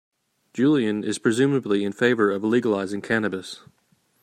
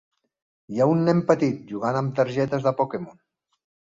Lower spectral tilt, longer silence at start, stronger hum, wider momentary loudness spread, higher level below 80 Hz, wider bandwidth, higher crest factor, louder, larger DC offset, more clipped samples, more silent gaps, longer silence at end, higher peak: second, -5.5 dB/octave vs -8 dB/octave; second, 0.55 s vs 0.7 s; neither; about the same, 12 LU vs 10 LU; about the same, -68 dBFS vs -64 dBFS; first, 13.5 kHz vs 7.8 kHz; about the same, 18 dB vs 20 dB; about the same, -22 LUFS vs -23 LUFS; neither; neither; neither; second, 0.65 s vs 0.85 s; about the same, -6 dBFS vs -4 dBFS